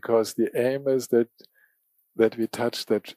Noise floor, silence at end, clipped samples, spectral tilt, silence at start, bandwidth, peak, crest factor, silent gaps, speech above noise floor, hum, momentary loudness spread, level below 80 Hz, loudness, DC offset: -69 dBFS; 0.05 s; under 0.1%; -5 dB/octave; 0.05 s; 15.5 kHz; -8 dBFS; 18 dB; none; 45 dB; none; 5 LU; -78 dBFS; -25 LUFS; under 0.1%